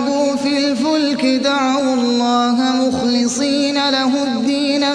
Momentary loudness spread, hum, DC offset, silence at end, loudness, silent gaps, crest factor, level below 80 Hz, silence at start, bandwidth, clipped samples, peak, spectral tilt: 2 LU; none; under 0.1%; 0 s; -16 LUFS; none; 12 dB; -58 dBFS; 0 s; 10.5 kHz; under 0.1%; -4 dBFS; -3 dB/octave